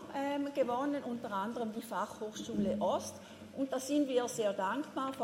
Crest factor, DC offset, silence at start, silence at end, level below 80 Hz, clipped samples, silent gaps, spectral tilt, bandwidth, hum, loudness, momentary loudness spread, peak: 16 dB; under 0.1%; 0 s; 0 s; -72 dBFS; under 0.1%; none; -4.5 dB/octave; 16 kHz; none; -36 LUFS; 7 LU; -20 dBFS